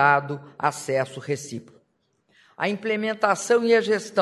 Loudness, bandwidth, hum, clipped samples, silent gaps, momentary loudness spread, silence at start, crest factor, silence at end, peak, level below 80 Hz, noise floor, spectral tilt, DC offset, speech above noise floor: -24 LUFS; 12.5 kHz; none; under 0.1%; none; 11 LU; 0 s; 20 dB; 0 s; -4 dBFS; -74 dBFS; -69 dBFS; -4.5 dB/octave; under 0.1%; 46 dB